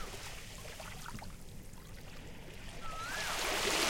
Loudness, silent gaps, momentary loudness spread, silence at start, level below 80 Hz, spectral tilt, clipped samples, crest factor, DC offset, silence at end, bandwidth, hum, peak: -41 LUFS; none; 18 LU; 0 s; -50 dBFS; -2 dB/octave; under 0.1%; 22 dB; under 0.1%; 0 s; 17 kHz; none; -18 dBFS